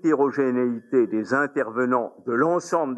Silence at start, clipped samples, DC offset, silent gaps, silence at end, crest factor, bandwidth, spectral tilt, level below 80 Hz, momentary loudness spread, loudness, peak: 0.05 s; under 0.1%; under 0.1%; none; 0 s; 14 dB; 10 kHz; -6.5 dB/octave; -84 dBFS; 4 LU; -23 LUFS; -8 dBFS